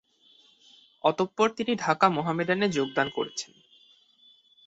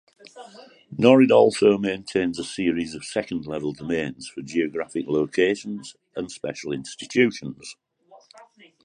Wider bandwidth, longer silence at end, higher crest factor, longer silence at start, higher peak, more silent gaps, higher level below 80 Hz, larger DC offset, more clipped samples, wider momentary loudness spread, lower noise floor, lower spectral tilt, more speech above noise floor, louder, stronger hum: second, 8.2 kHz vs 11 kHz; first, 1.25 s vs 1.1 s; about the same, 22 dB vs 22 dB; first, 1.05 s vs 0.25 s; second, -6 dBFS vs -2 dBFS; neither; second, -70 dBFS vs -60 dBFS; neither; neither; second, 10 LU vs 20 LU; first, -61 dBFS vs -53 dBFS; about the same, -4.5 dB/octave vs -5.5 dB/octave; first, 34 dB vs 30 dB; second, -26 LUFS vs -22 LUFS; neither